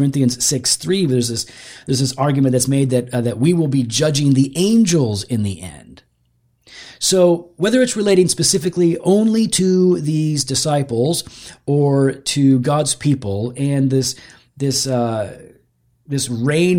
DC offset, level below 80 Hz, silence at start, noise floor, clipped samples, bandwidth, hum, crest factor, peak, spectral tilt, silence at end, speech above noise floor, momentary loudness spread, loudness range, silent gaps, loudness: under 0.1%; -52 dBFS; 0 s; -62 dBFS; under 0.1%; 16.5 kHz; none; 16 dB; -2 dBFS; -5 dB/octave; 0 s; 46 dB; 9 LU; 3 LU; none; -17 LUFS